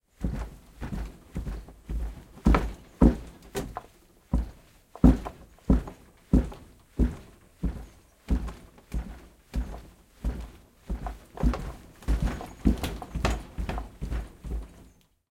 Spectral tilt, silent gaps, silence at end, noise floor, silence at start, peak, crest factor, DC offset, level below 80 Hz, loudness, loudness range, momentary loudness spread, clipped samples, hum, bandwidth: -7.5 dB/octave; none; 0.5 s; -57 dBFS; 0.2 s; -4 dBFS; 24 dB; under 0.1%; -32 dBFS; -31 LUFS; 10 LU; 20 LU; under 0.1%; none; 15.5 kHz